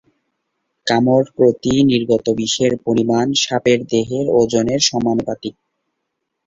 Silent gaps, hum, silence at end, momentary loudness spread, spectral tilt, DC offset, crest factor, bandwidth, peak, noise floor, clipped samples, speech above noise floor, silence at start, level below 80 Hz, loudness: none; none; 0.95 s; 5 LU; -4.5 dB/octave; under 0.1%; 16 dB; 7.8 kHz; -2 dBFS; -75 dBFS; under 0.1%; 59 dB; 0.85 s; -50 dBFS; -16 LUFS